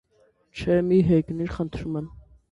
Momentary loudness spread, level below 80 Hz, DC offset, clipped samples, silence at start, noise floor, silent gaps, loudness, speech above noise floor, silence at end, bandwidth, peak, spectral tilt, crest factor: 15 LU; -46 dBFS; under 0.1%; under 0.1%; 0.55 s; -63 dBFS; none; -24 LUFS; 40 dB; 0.35 s; 10.5 kHz; -8 dBFS; -9 dB/octave; 16 dB